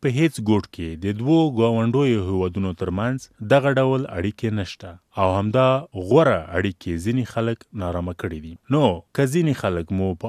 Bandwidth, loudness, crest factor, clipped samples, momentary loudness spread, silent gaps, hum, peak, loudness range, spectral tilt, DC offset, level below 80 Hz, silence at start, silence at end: 14.5 kHz; -22 LUFS; 18 dB; under 0.1%; 11 LU; none; none; -2 dBFS; 3 LU; -7 dB/octave; under 0.1%; -48 dBFS; 0 s; 0 s